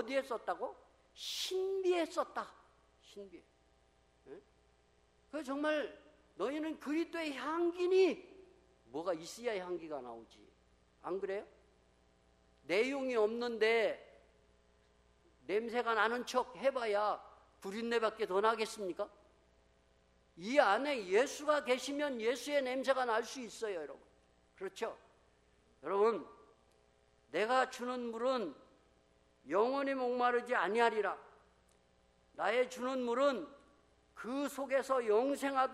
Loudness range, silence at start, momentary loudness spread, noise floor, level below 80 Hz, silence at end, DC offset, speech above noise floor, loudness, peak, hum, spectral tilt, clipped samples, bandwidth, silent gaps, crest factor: 8 LU; 0 s; 15 LU; -71 dBFS; -74 dBFS; 0 s; under 0.1%; 35 dB; -36 LUFS; -12 dBFS; none; -3.5 dB/octave; under 0.1%; 13 kHz; none; 24 dB